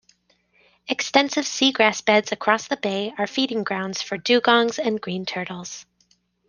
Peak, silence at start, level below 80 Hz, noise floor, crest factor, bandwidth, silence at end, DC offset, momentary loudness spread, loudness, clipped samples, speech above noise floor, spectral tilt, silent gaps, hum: -2 dBFS; 0.9 s; -68 dBFS; -64 dBFS; 22 dB; 10.5 kHz; 0.65 s; under 0.1%; 12 LU; -21 LUFS; under 0.1%; 42 dB; -3 dB/octave; none; 60 Hz at -55 dBFS